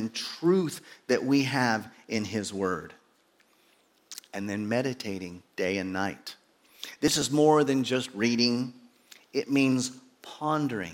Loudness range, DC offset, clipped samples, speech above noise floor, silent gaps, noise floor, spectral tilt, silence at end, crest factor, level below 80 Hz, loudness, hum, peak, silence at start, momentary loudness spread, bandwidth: 8 LU; under 0.1%; under 0.1%; 38 dB; none; -65 dBFS; -4.5 dB/octave; 0 s; 20 dB; -68 dBFS; -28 LUFS; none; -8 dBFS; 0 s; 17 LU; 17 kHz